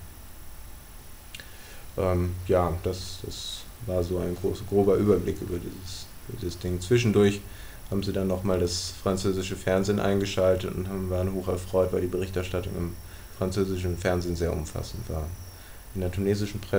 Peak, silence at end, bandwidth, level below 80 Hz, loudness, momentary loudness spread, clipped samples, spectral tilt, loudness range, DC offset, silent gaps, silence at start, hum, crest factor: -10 dBFS; 0 s; 16 kHz; -44 dBFS; -28 LUFS; 19 LU; under 0.1%; -6 dB/octave; 4 LU; under 0.1%; none; 0 s; none; 18 dB